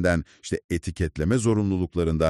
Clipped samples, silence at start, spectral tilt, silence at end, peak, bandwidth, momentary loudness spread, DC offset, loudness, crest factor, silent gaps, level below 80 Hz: under 0.1%; 0 s; -6.5 dB/octave; 0 s; -8 dBFS; 12.5 kHz; 9 LU; under 0.1%; -26 LUFS; 16 dB; 0.64-0.69 s; -38 dBFS